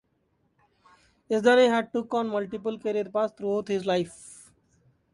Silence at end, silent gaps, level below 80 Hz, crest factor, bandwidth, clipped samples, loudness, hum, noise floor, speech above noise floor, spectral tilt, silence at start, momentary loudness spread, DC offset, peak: 0.8 s; none; -70 dBFS; 18 dB; 11.5 kHz; under 0.1%; -26 LUFS; none; -71 dBFS; 46 dB; -5 dB/octave; 1.3 s; 12 LU; under 0.1%; -8 dBFS